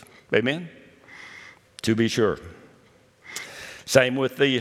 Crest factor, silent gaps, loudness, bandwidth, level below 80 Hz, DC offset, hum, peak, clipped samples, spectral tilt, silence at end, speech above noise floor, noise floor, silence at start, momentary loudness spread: 26 dB; none; -23 LUFS; 16 kHz; -62 dBFS; under 0.1%; none; 0 dBFS; under 0.1%; -4.5 dB/octave; 0 s; 35 dB; -57 dBFS; 0.3 s; 23 LU